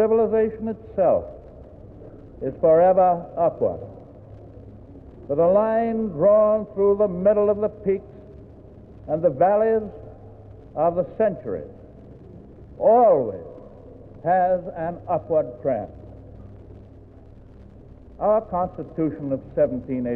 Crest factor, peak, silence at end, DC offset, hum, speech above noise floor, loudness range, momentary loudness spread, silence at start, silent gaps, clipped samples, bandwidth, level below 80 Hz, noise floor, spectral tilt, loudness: 16 dB; -8 dBFS; 0 s; under 0.1%; none; 25 dB; 8 LU; 22 LU; 0 s; none; under 0.1%; 3.2 kHz; -48 dBFS; -45 dBFS; -11.5 dB/octave; -21 LUFS